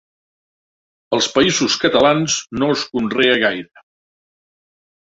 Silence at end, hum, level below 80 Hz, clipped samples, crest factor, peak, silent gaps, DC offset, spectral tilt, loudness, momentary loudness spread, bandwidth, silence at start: 1.4 s; none; -54 dBFS; under 0.1%; 18 dB; 0 dBFS; none; under 0.1%; -3 dB/octave; -16 LUFS; 6 LU; 8 kHz; 1.1 s